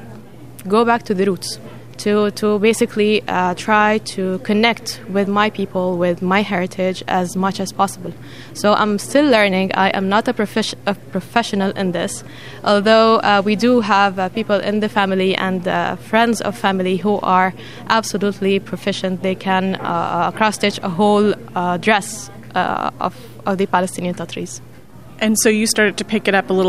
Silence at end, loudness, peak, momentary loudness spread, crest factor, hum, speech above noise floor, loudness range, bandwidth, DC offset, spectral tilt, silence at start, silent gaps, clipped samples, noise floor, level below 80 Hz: 0 s; -17 LUFS; 0 dBFS; 10 LU; 18 dB; none; 23 dB; 4 LU; 15.5 kHz; 0.8%; -4.5 dB/octave; 0 s; none; under 0.1%; -40 dBFS; -54 dBFS